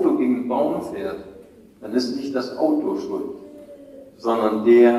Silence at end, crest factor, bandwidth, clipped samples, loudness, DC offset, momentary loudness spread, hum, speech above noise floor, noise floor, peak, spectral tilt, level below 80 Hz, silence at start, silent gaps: 0 s; 16 dB; 12 kHz; under 0.1%; -22 LUFS; under 0.1%; 22 LU; none; 26 dB; -46 dBFS; -4 dBFS; -6 dB/octave; -62 dBFS; 0 s; none